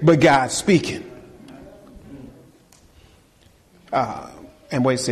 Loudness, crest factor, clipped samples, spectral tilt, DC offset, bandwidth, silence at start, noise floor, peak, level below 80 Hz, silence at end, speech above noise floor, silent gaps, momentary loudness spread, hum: -20 LUFS; 18 dB; under 0.1%; -5 dB/octave; under 0.1%; 13 kHz; 0 s; -55 dBFS; -4 dBFS; -52 dBFS; 0 s; 37 dB; none; 28 LU; none